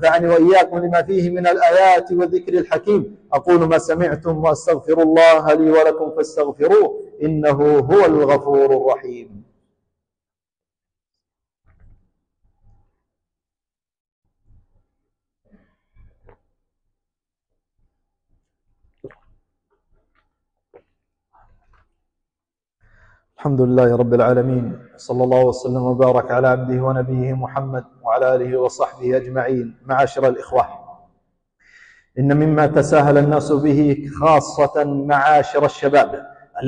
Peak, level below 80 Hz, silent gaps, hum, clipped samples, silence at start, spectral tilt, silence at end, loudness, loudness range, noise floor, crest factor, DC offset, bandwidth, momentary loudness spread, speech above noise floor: -4 dBFS; -50 dBFS; 14.00-14.05 s, 14.12-14.22 s; none; under 0.1%; 0 s; -7 dB/octave; 0 s; -16 LUFS; 6 LU; under -90 dBFS; 14 dB; under 0.1%; 10 kHz; 10 LU; over 75 dB